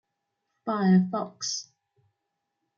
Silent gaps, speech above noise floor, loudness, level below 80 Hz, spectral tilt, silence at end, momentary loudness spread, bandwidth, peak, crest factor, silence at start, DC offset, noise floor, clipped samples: none; 57 dB; -26 LUFS; -76 dBFS; -5.5 dB/octave; 1.15 s; 12 LU; 7.4 kHz; -12 dBFS; 18 dB; 0.65 s; under 0.1%; -82 dBFS; under 0.1%